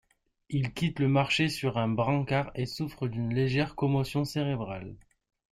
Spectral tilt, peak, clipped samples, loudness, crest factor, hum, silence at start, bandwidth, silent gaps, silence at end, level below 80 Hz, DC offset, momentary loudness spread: -6.5 dB/octave; -14 dBFS; under 0.1%; -29 LUFS; 16 dB; none; 0.5 s; 15 kHz; none; 0.55 s; -56 dBFS; under 0.1%; 8 LU